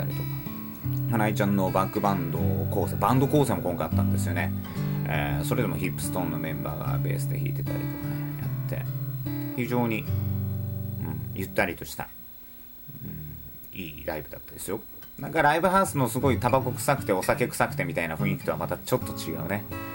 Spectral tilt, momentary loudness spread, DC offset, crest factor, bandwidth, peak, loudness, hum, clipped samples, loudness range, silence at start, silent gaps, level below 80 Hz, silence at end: -6.5 dB/octave; 13 LU; under 0.1%; 20 dB; 17 kHz; -6 dBFS; -27 LUFS; none; under 0.1%; 8 LU; 0 s; none; -50 dBFS; 0 s